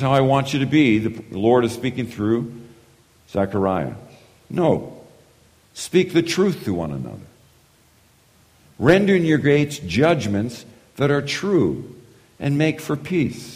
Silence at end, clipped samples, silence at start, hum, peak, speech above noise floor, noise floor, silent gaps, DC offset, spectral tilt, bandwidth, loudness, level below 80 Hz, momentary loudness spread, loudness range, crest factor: 0 s; under 0.1%; 0 s; none; -2 dBFS; 36 dB; -56 dBFS; none; under 0.1%; -6.5 dB/octave; 15.5 kHz; -20 LUFS; -52 dBFS; 15 LU; 5 LU; 20 dB